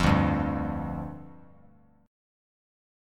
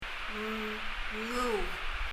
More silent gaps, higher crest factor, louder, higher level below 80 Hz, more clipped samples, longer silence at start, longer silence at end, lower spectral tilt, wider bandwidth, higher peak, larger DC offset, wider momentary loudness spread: neither; first, 22 dB vs 14 dB; first, -29 LUFS vs -35 LUFS; about the same, -40 dBFS vs -42 dBFS; neither; about the same, 0 s vs 0 s; first, 1.7 s vs 0 s; first, -7 dB/octave vs -3.5 dB/octave; second, 13 kHz vs 15.5 kHz; first, -8 dBFS vs -20 dBFS; neither; first, 21 LU vs 5 LU